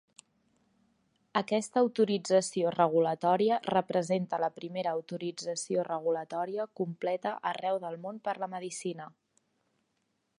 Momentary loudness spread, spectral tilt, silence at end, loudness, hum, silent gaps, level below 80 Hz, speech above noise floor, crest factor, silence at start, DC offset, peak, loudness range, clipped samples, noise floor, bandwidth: 10 LU; -5 dB/octave; 1.3 s; -31 LUFS; none; none; -80 dBFS; 48 dB; 22 dB; 1.35 s; under 0.1%; -10 dBFS; 7 LU; under 0.1%; -78 dBFS; 11 kHz